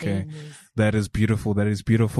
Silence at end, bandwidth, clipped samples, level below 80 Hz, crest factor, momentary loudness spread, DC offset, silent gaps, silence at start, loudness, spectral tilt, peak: 0 s; 12.5 kHz; under 0.1%; -42 dBFS; 14 dB; 12 LU; under 0.1%; none; 0 s; -23 LUFS; -7 dB/octave; -8 dBFS